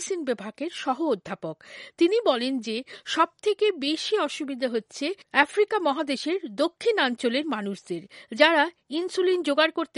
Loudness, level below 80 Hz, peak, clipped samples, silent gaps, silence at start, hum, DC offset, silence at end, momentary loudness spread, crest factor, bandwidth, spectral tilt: -25 LUFS; -78 dBFS; -2 dBFS; under 0.1%; none; 0 s; none; under 0.1%; 0.1 s; 12 LU; 24 dB; 11.5 kHz; -3.5 dB/octave